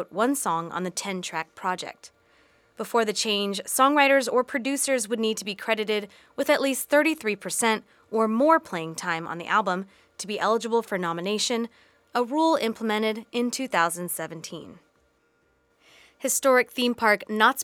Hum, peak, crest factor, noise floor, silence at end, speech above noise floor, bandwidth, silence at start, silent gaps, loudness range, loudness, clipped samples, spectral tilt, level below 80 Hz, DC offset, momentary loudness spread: none; -4 dBFS; 20 dB; -67 dBFS; 0 s; 42 dB; 19.5 kHz; 0 s; none; 5 LU; -25 LUFS; under 0.1%; -3 dB/octave; -74 dBFS; under 0.1%; 11 LU